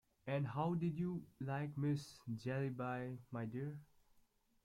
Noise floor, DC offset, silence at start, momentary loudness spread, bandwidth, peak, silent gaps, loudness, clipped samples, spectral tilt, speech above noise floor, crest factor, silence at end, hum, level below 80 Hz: -74 dBFS; under 0.1%; 0.25 s; 8 LU; 12.5 kHz; -28 dBFS; none; -43 LUFS; under 0.1%; -8 dB/octave; 32 dB; 16 dB; 0.8 s; none; -74 dBFS